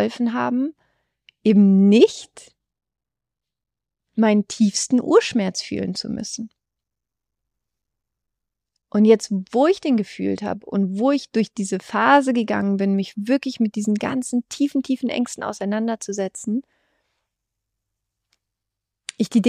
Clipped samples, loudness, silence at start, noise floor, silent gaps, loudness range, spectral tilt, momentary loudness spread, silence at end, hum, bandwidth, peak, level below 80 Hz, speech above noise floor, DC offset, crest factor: under 0.1%; -20 LUFS; 0 s; -87 dBFS; none; 9 LU; -5.5 dB/octave; 12 LU; 0 s; none; 11 kHz; -2 dBFS; -66 dBFS; 67 dB; under 0.1%; 20 dB